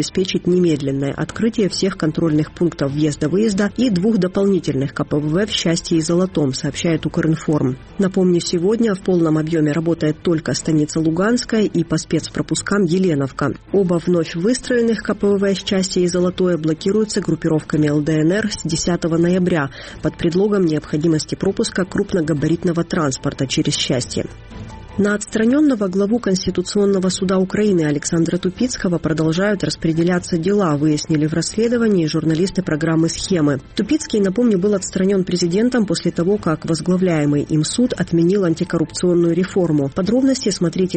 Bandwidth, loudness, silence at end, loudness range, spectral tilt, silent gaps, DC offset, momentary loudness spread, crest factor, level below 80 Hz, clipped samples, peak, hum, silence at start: 8.8 kHz; -18 LUFS; 0 s; 1 LU; -5.5 dB/octave; none; under 0.1%; 4 LU; 12 dB; -44 dBFS; under 0.1%; -6 dBFS; none; 0 s